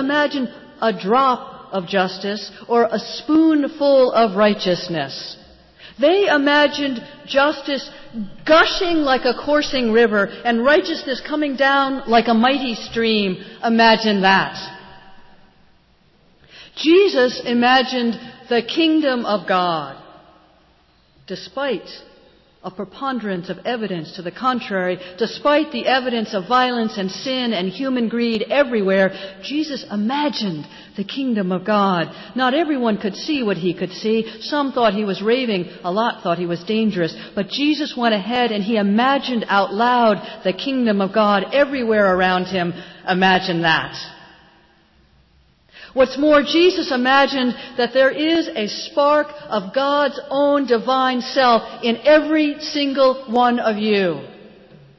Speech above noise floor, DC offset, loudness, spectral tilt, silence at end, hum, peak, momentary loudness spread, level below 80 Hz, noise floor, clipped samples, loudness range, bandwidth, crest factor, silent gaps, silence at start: 38 dB; under 0.1%; -18 LUFS; -5.5 dB/octave; 0.5 s; none; -4 dBFS; 11 LU; -54 dBFS; -56 dBFS; under 0.1%; 5 LU; 7.2 kHz; 16 dB; none; 0 s